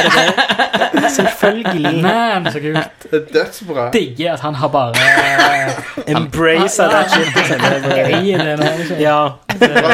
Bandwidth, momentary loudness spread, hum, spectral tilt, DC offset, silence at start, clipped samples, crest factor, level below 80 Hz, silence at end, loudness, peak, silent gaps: 17 kHz; 8 LU; none; -4 dB/octave; under 0.1%; 0 s; under 0.1%; 14 dB; -48 dBFS; 0 s; -13 LUFS; 0 dBFS; none